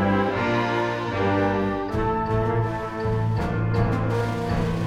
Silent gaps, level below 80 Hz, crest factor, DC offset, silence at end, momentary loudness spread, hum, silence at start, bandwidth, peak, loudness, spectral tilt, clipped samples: none; -38 dBFS; 14 dB; under 0.1%; 0 s; 3 LU; none; 0 s; 9.8 kHz; -10 dBFS; -24 LUFS; -7.5 dB/octave; under 0.1%